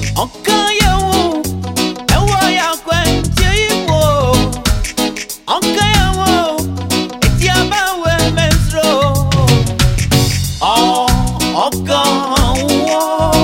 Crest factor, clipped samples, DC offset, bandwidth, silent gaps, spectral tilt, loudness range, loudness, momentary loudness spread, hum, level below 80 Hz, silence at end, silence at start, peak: 12 dB; under 0.1%; under 0.1%; 16.5 kHz; none; -4.5 dB/octave; 1 LU; -13 LUFS; 6 LU; none; -22 dBFS; 0 s; 0 s; 0 dBFS